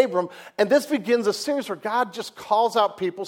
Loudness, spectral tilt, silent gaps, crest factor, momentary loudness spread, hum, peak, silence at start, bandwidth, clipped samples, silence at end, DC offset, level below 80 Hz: -23 LUFS; -4 dB/octave; none; 18 dB; 7 LU; none; -4 dBFS; 0 s; 17 kHz; under 0.1%; 0 s; under 0.1%; -72 dBFS